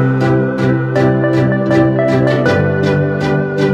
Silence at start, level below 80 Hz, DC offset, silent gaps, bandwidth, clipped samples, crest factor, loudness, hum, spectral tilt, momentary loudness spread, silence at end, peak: 0 s; -42 dBFS; under 0.1%; none; 8.2 kHz; under 0.1%; 12 dB; -13 LUFS; none; -8 dB/octave; 3 LU; 0 s; 0 dBFS